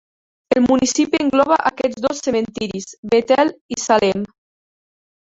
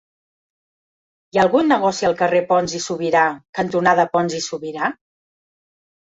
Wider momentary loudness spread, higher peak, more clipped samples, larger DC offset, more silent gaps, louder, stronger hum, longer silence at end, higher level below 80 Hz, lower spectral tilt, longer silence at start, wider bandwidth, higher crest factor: about the same, 11 LU vs 9 LU; about the same, -2 dBFS vs -2 dBFS; neither; neither; first, 2.98-3.03 s, 3.61-3.69 s vs 3.49-3.53 s; about the same, -18 LUFS vs -18 LUFS; neither; about the same, 1 s vs 1.1 s; first, -54 dBFS vs -60 dBFS; about the same, -4 dB/octave vs -4.5 dB/octave; second, 0.5 s vs 1.35 s; about the same, 8 kHz vs 8 kHz; about the same, 16 dB vs 18 dB